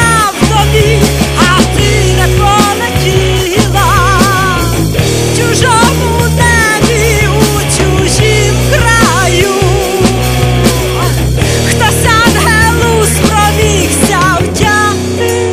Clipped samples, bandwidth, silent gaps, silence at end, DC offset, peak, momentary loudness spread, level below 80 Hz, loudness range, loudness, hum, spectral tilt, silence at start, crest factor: 0.7%; 16 kHz; none; 0 s; under 0.1%; 0 dBFS; 4 LU; -18 dBFS; 1 LU; -8 LUFS; none; -4.5 dB/octave; 0 s; 8 dB